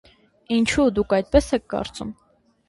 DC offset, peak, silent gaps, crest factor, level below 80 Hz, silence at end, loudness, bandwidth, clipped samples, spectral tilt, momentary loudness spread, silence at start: under 0.1%; -2 dBFS; none; 20 dB; -38 dBFS; 0.55 s; -21 LUFS; 11.5 kHz; under 0.1%; -5 dB/octave; 13 LU; 0.5 s